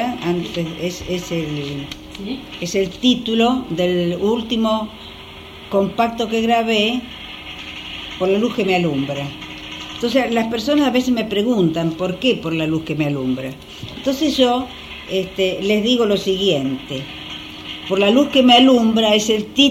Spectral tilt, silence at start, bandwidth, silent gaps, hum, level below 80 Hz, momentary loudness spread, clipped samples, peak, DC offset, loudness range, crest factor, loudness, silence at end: -5 dB/octave; 0 s; 16 kHz; none; none; -46 dBFS; 16 LU; under 0.1%; 0 dBFS; under 0.1%; 5 LU; 18 dB; -18 LUFS; 0 s